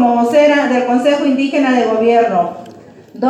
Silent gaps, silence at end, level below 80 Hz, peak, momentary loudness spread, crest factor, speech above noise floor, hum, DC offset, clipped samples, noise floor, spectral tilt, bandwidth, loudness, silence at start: none; 0 s; -66 dBFS; 0 dBFS; 6 LU; 12 dB; 25 dB; none; under 0.1%; under 0.1%; -37 dBFS; -5 dB/octave; 12 kHz; -13 LUFS; 0 s